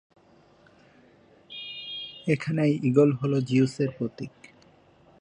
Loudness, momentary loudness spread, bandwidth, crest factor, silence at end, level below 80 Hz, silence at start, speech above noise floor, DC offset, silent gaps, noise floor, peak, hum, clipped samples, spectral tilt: -26 LUFS; 18 LU; 10 kHz; 22 dB; 0.95 s; -68 dBFS; 1.5 s; 34 dB; under 0.1%; none; -58 dBFS; -6 dBFS; none; under 0.1%; -7.5 dB/octave